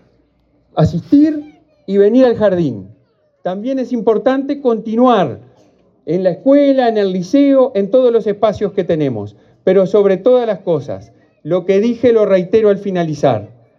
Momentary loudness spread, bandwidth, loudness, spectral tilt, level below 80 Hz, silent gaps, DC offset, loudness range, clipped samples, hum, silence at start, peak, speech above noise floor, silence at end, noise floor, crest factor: 11 LU; 7.2 kHz; -14 LUFS; -8 dB/octave; -52 dBFS; none; under 0.1%; 3 LU; under 0.1%; none; 0.75 s; 0 dBFS; 44 dB; 0.35 s; -56 dBFS; 14 dB